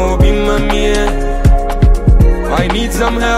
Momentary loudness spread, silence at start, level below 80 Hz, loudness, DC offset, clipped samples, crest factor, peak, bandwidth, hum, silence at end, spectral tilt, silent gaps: 4 LU; 0 s; -12 dBFS; -13 LUFS; under 0.1%; under 0.1%; 10 dB; 0 dBFS; 14 kHz; none; 0 s; -6 dB/octave; none